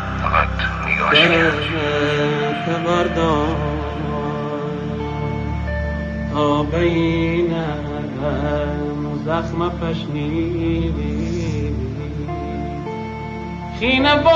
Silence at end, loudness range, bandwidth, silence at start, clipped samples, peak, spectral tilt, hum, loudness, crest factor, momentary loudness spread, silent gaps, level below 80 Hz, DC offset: 0 s; 6 LU; 7.8 kHz; 0 s; under 0.1%; 0 dBFS; -6.5 dB/octave; none; -20 LUFS; 20 dB; 10 LU; none; -30 dBFS; under 0.1%